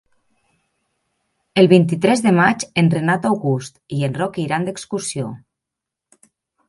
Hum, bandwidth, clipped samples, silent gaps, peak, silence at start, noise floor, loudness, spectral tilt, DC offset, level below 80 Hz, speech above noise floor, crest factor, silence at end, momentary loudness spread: none; 11.5 kHz; under 0.1%; none; 0 dBFS; 1.55 s; -84 dBFS; -18 LUFS; -6 dB/octave; under 0.1%; -60 dBFS; 67 dB; 18 dB; 1.3 s; 12 LU